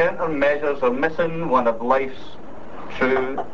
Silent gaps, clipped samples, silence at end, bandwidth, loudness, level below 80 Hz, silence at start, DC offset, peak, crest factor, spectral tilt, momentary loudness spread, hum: none; under 0.1%; 0 s; 7.4 kHz; -21 LUFS; -50 dBFS; 0 s; 4%; -6 dBFS; 18 dB; -7 dB/octave; 19 LU; none